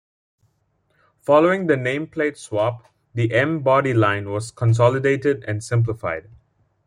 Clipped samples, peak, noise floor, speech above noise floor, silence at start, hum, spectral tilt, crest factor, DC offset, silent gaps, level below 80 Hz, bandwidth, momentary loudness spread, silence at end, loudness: under 0.1%; -2 dBFS; -67 dBFS; 47 dB; 1.3 s; none; -7 dB/octave; 18 dB; under 0.1%; none; -56 dBFS; 11 kHz; 11 LU; 0.65 s; -20 LUFS